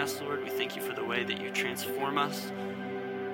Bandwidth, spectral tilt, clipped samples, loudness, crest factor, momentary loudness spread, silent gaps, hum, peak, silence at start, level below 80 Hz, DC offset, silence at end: 17 kHz; -3.5 dB/octave; under 0.1%; -33 LUFS; 18 dB; 6 LU; none; none; -14 dBFS; 0 s; -78 dBFS; under 0.1%; 0 s